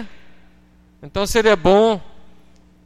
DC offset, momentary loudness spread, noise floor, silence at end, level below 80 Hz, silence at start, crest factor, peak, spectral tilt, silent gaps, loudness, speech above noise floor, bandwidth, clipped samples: under 0.1%; 15 LU; -51 dBFS; 0.65 s; -38 dBFS; 0 s; 20 dB; 0 dBFS; -4.5 dB/octave; none; -16 LUFS; 36 dB; 15.5 kHz; under 0.1%